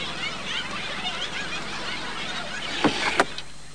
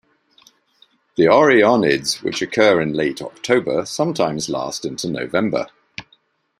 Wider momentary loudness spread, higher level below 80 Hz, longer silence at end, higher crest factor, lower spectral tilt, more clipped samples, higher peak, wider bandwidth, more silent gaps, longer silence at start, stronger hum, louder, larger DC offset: second, 7 LU vs 16 LU; first, -52 dBFS vs -58 dBFS; second, 0 s vs 0.6 s; first, 26 dB vs 18 dB; second, -2.5 dB/octave vs -4.5 dB/octave; neither; about the same, -4 dBFS vs -2 dBFS; second, 10.5 kHz vs 15.5 kHz; neither; second, 0 s vs 1.2 s; first, 50 Hz at -50 dBFS vs none; second, -27 LUFS vs -18 LUFS; first, 2% vs under 0.1%